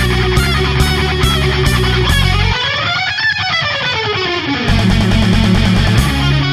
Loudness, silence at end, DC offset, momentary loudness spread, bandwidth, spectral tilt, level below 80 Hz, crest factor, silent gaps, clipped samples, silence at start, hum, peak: -13 LUFS; 0 s; under 0.1%; 3 LU; 15 kHz; -5 dB/octave; -20 dBFS; 12 dB; none; under 0.1%; 0 s; none; 0 dBFS